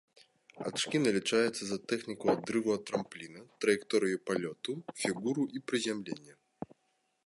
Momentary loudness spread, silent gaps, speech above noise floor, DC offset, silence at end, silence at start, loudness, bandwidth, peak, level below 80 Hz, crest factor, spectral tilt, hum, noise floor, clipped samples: 16 LU; none; 44 dB; under 0.1%; 0.6 s; 0.55 s; -33 LUFS; 11.5 kHz; -14 dBFS; -76 dBFS; 20 dB; -4 dB/octave; none; -77 dBFS; under 0.1%